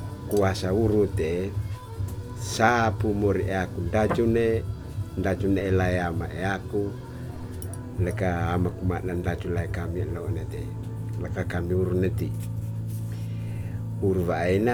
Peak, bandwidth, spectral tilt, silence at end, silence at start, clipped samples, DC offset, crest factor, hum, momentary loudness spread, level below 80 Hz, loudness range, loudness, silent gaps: -6 dBFS; 18 kHz; -7 dB/octave; 0 s; 0 s; under 0.1%; under 0.1%; 20 dB; none; 11 LU; -42 dBFS; 4 LU; -27 LUFS; none